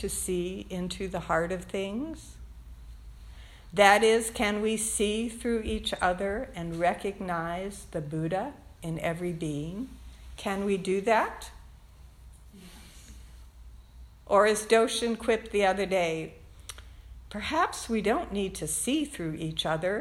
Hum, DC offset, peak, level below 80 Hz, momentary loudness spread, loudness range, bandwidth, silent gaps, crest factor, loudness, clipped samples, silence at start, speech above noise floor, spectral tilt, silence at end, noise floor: none; under 0.1%; -6 dBFS; -48 dBFS; 24 LU; 8 LU; 16.5 kHz; none; 24 dB; -28 LUFS; under 0.1%; 0 s; 23 dB; -4 dB/octave; 0 s; -51 dBFS